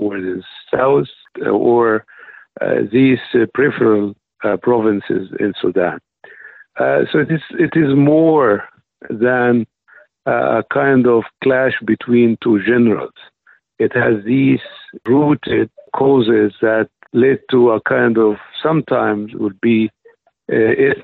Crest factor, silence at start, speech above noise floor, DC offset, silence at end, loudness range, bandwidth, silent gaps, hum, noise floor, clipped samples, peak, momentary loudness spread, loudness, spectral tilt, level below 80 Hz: 12 dB; 0 s; 37 dB; under 0.1%; 0 s; 3 LU; 4.3 kHz; none; none; -51 dBFS; under 0.1%; -4 dBFS; 10 LU; -15 LUFS; -10 dB/octave; -56 dBFS